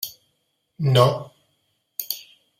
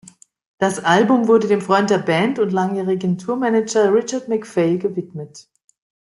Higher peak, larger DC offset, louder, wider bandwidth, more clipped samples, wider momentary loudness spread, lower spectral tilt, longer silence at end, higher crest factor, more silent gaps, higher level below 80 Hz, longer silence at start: about the same, -2 dBFS vs -2 dBFS; neither; second, -23 LUFS vs -18 LUFS; first, 16 kHz vs 11.5 kHz; neither; first, 16 LU vs 9 LU; about the same, -5.5 dB/octave vs -5.5 dB/octave; second, 0.4 s vs 0.6 s; first, 22 dB vs 16 dB; neither; about the same, -62 dBFS vs -64 dBFS; second, 0 s vs 0.6 s